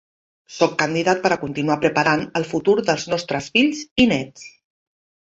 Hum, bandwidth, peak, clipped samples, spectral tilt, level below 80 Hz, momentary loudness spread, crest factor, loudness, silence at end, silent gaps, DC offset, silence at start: none; 8 kHz; -2 dBFS; under 0.1%; -4.5 dB/octave; -54 dBFS; 6 LU; 18 dB; -20 LUFS; 0.8 s; 3.91-3.96 s; under 0.1%; 0.5 s